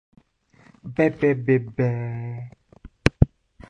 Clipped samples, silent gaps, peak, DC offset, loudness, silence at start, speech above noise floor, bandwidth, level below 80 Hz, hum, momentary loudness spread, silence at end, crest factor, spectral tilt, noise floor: under 0.1%; none; -2 dBFS; under 0.1%; -23 LUFS; 0.85 s; 35 dB; 11 kHz; -36 dBFS; none; 16 LU; 0.45 s; 22 dB; -8 dB/octave; -57 dBFS